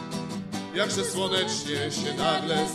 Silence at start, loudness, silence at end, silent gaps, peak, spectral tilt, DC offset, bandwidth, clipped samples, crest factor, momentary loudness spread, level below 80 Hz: 0 s; -27 LUFS; 0 s; none; -10 dBFS; -3.5 dB/octave; under 0.1%; 15 kHz; under 0.1%; 18 dB; 8 LU; -62 dBFS